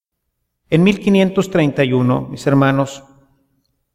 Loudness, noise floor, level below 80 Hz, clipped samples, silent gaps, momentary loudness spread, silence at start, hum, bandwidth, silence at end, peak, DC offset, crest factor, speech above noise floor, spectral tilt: -15 LUFS; -73 dBFS; -50 dBFS; under 0.1%; none; 6 LU; 0.7 s; none; 14 kHz; 0.95 s; -2 dBFS; under 0.1%; 16 dB; 59 dB; -7 dB/octave